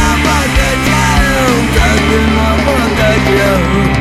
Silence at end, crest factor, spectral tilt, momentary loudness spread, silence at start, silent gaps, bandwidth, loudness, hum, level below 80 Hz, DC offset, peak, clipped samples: 0 s; 10 dB; -5 dB/octave; 1 LU; 0 s; none; 16 kHz; -10 LUFS; none; -18 dBFS; under 0.1%; 0 dBFS; under 0.1%